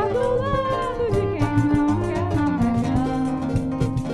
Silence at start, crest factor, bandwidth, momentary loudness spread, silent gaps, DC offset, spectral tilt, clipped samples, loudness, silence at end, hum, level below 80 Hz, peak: 0 s; 14 dB; 12 kHz; 4 LU; none; under 0.1%; -8 dB/octave; under 0.1%; -22 LUFS; 0 s; none; -36 dBFS; -8 dBFS